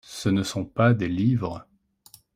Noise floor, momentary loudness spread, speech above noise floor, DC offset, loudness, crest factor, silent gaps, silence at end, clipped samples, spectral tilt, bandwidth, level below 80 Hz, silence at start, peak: -55 dBFS; 10 LU; 32 dB; under 0.1%; -24 LUFS; 20 dB; none; 0.75 s; under 0.1%; -6.5 dB/octave; 15.5 kHz; -56 dBFS; 0.1 s; -6 dBFS